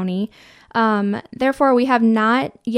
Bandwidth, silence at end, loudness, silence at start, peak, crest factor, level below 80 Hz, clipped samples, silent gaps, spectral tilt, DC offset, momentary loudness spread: 11 kHz; 0 s; -18 LUFS; 0 s; -4 dBFS; 16 dB; -58 dBFS; under 0.1%; none; -7 dB/octave; under 0.1%; 10 LU